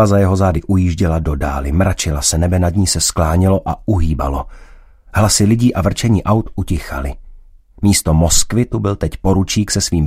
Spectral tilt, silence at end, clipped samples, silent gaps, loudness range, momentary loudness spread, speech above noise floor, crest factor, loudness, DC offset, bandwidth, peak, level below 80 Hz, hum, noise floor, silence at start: -5 dB/octave; 0 s; under 0.1%; none; 1 LU; 9 LU; 26 dB; 14 dB; -15 LUFS; under 0.1%; 16 kHz; 0 dBFS; -26 dBFS; none; -40 dBFS; 0 s